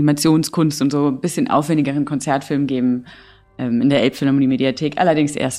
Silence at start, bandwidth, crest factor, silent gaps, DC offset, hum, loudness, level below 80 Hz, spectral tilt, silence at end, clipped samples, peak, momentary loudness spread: 0 s; 15 kHz; 14 dB; none; under 0.1%; none; -18 LUFS; -56 dBFS; -5.5 dB/octave; 0 s; under 0.1%; -4 dBFS; 5 LU